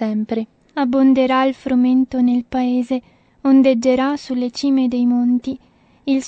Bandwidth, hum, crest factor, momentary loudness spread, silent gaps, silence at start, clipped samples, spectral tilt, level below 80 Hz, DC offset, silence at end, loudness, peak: 8 kHz; none; 14 dB; 11 LU; none; 0 s; under 0.1%; -5.5 dB/octave; -54 dBFS; under 0.1%; 0 s; -17 LUFS; -4 dBFS